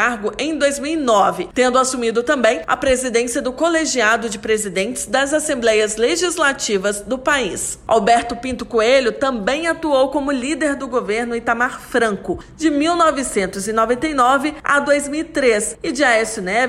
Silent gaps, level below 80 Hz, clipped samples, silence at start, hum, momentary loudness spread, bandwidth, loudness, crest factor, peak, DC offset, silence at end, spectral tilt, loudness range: none; -44 dBFS; under 0.1%; 0 s; none; 6 LU; 15 kHz; -17 LUFS; 14 dB; -4 dBFS; under 0.1%; 0 s; -3 dB/octave; 2 LU